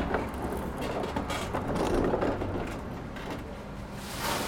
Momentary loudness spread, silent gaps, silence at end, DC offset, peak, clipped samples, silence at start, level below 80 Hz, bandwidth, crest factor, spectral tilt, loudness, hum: 11 LU; none; 0 s; under 0.1%; -14 dBFS; under 0.1%; 0 s; -42 dBFS; 20 kHz; 18 dB; -5.5 dB/octave; -33 LUFS; none